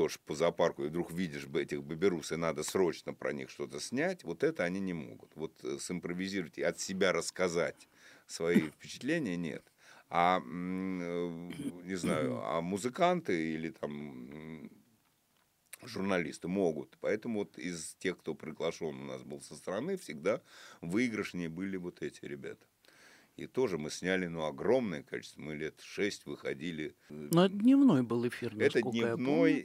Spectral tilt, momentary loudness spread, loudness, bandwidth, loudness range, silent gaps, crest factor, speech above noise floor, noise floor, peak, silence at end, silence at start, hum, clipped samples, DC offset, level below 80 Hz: -5.5 dB/octave; 14 LU; -34 LUFS; 15.5 kHz; 7 LU; none; 22 dB; 39 dB; -73 dBFS; -14 dBFS; 0 s; 0 s; none; under 0.1%; under 0.1%; -70 dBFS